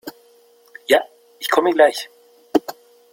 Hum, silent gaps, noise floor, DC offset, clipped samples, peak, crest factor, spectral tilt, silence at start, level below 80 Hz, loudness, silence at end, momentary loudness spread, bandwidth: none; none; -53 dBFS; under 0.1%; under 0.1%; -2 dBFS; 20 dB; -2.5 dB/octave; 0.05 s; -64 dBFS; -19 LUFS; 0.4 s; 21 LU; 16.5 kHz